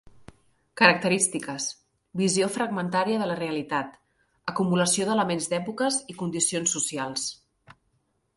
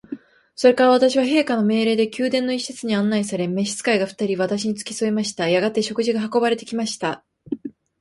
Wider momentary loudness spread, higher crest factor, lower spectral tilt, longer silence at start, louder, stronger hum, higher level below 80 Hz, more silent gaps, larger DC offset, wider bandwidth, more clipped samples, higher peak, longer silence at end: second, 12 LU vs 15 LU; first, 26 dB vs 18 dB; about the same, -3.5 dB/octave vs -4.5 dB/octave; about the same, 0.2 s vs 0.1 s; second, -25 LUFS vs -20 LUFS; neither; about the same, -66 dBFS vs -64 dBFS; neither; neither; about the same, 12 kHz vs 11.5 kHz; neither; about the same, -2 dBFS vs -4 dBFS; first, 0.65 s vs 0.3 s